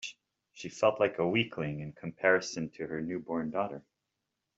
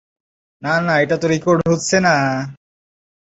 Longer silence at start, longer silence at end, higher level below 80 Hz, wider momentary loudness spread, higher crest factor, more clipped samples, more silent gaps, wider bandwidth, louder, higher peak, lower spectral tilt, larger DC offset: second, 0 s vs 0.6 s; about the same, 0.75 s vs 0.75 s; second, -70 dBFS vs -52 dBFS; first, 15 LU vs 10 LU; first, 22 dB vs 16 dB; neither; neither; about the same, 8 kHz vs 8 kHz; second, -32 LUFS vs -16 LUFS; second, -12 dBFS vs -2 dBFS; about the same, -5 dB/octave vs -5 dB/octave; neither